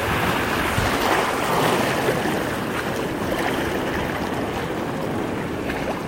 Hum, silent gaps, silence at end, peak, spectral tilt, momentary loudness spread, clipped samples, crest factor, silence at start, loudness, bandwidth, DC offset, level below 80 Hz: none; none; 0 s; -6 dBFS; -4.5 dB/octave; 6 LU; under 0.1%; 18 dB; 0 s; -23 LUFS; 16 kHz; under 0.1%; -40 dBFS